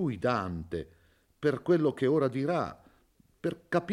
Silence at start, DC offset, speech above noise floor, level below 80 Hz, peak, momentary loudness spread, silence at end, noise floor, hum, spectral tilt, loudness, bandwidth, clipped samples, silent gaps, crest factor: 0 s; under 0.1%; 36 dB; -62 dBFS; -14 dBFS; 12 LU; 0 s; -66 dBFS; none; -8 dB/octave; -30 LUFS; 12 kHz; under 0.1%; none; 18 dB